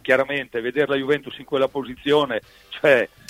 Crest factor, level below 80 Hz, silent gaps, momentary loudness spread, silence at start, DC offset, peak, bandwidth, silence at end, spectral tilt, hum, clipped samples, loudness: 18 dB; -58 dBFS; none; 9 LU; 0.05 s; under 0.1%; -2 dBFS; 15.5 kHz; 0.25 s; -5.5 dB/octave; none; under 0.1%; -22 LUFS